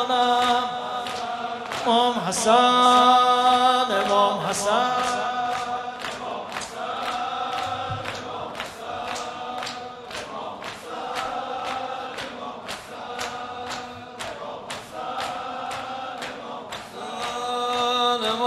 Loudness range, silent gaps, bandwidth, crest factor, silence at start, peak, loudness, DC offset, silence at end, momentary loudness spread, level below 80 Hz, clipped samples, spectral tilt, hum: 14 LU; none; 14 kHz; 20 dB; 0 s; -6 dBFS; -24 LUFS; under 0.1%; 0 s; 16 LU; -62 dBFS; under 0.1%; -2.5 dB/octave; none